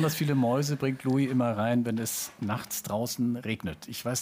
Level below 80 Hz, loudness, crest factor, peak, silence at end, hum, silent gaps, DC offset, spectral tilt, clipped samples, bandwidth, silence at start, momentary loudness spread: -62 dBFS; -29 LUFS; 14 dB; -14 dBFS; 0 s; none; none; under 0.1%; -5.5 dB/octave; under 0.1%; 16 kHz; 0 s; 8 LU